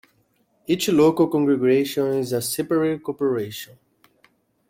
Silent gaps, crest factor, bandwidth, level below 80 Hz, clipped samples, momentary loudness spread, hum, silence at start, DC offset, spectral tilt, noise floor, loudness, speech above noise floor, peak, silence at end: none; 16 dB; 16.5 kHz; -62 dBFS; under 0.1%; 13 LU; none; 0.7 s; under 0.1%; -5.5 dB/octave; -65 dBFS; -21 LUFS; 44 dB; -6 dBFS; 1.05 s